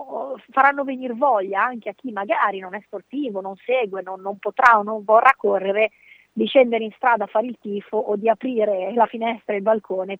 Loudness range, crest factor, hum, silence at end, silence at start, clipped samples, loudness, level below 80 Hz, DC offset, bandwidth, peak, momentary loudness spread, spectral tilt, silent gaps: 5 LU; 20 dB; none; 0 s; 0 s; under 0.1%; -20 LUFS; -74 dBFS; under 0.1%; 8.4 kHz; 0 dBFS; 15 LU; -6 dB/octave; none